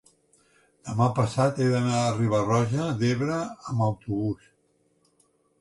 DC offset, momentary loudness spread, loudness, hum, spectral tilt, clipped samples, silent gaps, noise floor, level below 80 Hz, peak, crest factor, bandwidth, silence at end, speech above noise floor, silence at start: under 0.1%; 8 LU; -26 LUFS; none; -6.5 dB/octave; under 0.1%; none; -68 dBFS; -56 dBFS; -10 dBFS; 16 dB; 11.5 kHz; 1.25 s; 43 dB; 0.85 s